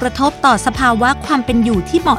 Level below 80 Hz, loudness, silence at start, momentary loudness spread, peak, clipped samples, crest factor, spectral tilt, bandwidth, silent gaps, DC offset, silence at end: -32 dBFS; -14 LUFS; 0 s; 3 LU; 0 dBFS; under 0.1%; 14 dB; -5 dB/octave; 14.5 kHz; none; under 0.1%; 0 s